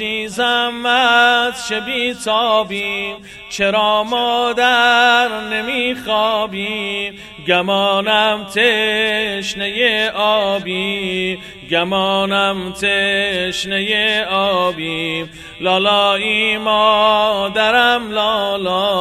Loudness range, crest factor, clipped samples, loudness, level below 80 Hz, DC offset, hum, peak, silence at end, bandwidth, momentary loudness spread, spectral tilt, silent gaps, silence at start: 3 LU; 16 dB; under 0.1%; -15 LUFS; -50 dBFS; under 0.1%; none; 0 dBFS; 0 s; 15 kHz; 9 LU; -3 dB/octave; none; 0 s